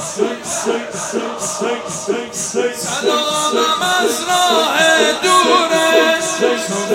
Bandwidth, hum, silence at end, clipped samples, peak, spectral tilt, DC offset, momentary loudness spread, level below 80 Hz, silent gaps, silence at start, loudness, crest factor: 16.5 kHz; none; 0 s; under 0.1%; 0 dBFS; -1.5 dB/octave; under 0.1%; 9 LU; -60 dBFS; none; 0 s; -15 LUFS; 16 dB